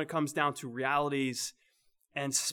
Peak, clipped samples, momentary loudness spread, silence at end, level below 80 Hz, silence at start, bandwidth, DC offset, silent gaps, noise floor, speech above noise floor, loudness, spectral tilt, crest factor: -14 dBFS; under 0.1%; 8 LU; 0 s; -76 dBFS; 0 s; 20 kHz; under 0.1%; none; -72 dBFS; 39 dB; -33 LUFS; -3 dB/octave; 20 dB